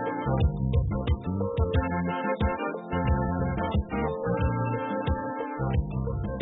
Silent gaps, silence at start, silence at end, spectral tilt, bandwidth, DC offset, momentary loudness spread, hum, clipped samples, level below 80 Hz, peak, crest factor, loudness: none; 0 s; 0 s; -12 dB/octave; 4 kHz; under 0.1%; 4 LU; none; under 0.1%; -34 dBFS; -14 dBFS; 14 dB; -28 LUFS